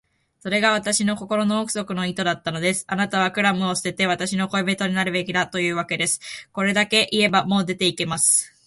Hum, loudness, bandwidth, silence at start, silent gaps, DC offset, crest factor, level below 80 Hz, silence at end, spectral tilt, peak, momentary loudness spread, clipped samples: none; -21 LUFS; 12 kHz; 0.45 s; none; under 0.1%; 18 dB; -60 dBFS; 0.2 s; -3 dB/octave; -4 dBFS; 6 LU; under 0.1%